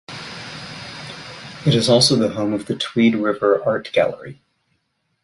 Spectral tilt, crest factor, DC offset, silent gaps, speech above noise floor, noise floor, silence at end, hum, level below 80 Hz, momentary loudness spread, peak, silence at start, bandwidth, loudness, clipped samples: -5 dB/octave; 18 dB; under 0.1%; none; 52 dB; -70 dBFS; 0.9 s; none; -54 dBFS; 19 LU; -2 dBFS; 0.1 s; 11.5 kHz; -18 LUFS; under 0.1%